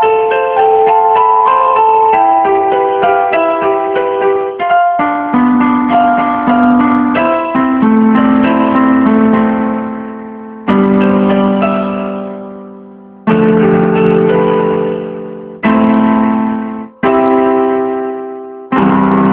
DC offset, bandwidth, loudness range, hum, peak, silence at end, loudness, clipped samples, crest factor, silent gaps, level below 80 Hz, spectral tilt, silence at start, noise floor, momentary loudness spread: under 0.1%; 4.2 kHz; 3 LU; none; 0 dBFS; 0 s; -11 LUFS; under 0.1%; 10 dB; none; -46 dBFS; -10.5 dB/octave; 0 s; -33 dBFS; 12 LU